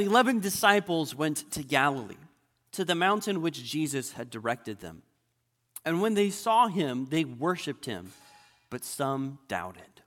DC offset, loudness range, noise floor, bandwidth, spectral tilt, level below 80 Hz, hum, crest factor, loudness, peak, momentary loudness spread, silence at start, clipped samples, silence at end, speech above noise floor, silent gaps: under 0.1%; 4 LU; -76 dBFS; 17.5 kHz; -4 dB/octave; -68 dBFS; none; 24 dB; -28 LUFS; -6 dBFS; 17 LU; 0 s; under 0.1%; 0.2 s; 48 dB; none